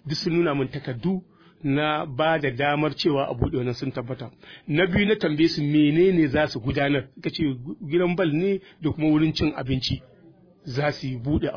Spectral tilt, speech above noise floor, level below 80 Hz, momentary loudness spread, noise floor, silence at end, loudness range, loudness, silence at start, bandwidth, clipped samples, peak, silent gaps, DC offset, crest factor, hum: -7 dB/octave; 30 dB; -46 dBFS; 11 LU; -53 dBFS; 0 s; 3 LU; -24 LUFS; 0.05 s; 5.4 kHz; under 0.1%; -8 dBFS; none; under 0.1%; 16 dB; none